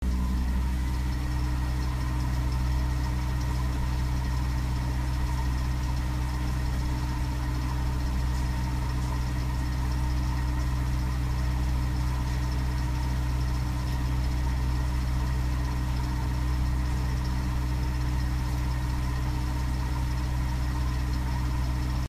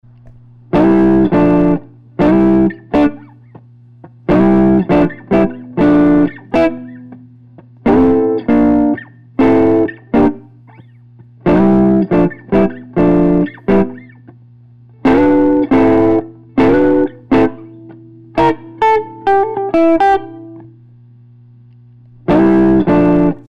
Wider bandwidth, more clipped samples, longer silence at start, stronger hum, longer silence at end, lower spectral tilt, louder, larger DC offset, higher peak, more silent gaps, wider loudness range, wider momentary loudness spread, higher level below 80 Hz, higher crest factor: first, 15 kHz vs 6.2 kHz; neither; second, 0 s vs 0.25 s; neither; second, 0 s vs 0.15 s; second, -6 dB/octave vs -9.5 dB/octave; second, -30 LUFS vs -12 LUFS; second, under 0.1% vs 1%; second, -18 dBFS vs -4 dBFS; neither; about the same, 1 LU vs 2 LU; second, 1 LU vs 8 LU; first, -28 dBFS vs -36 dBFS; about the same, 10 dB vs 8 dB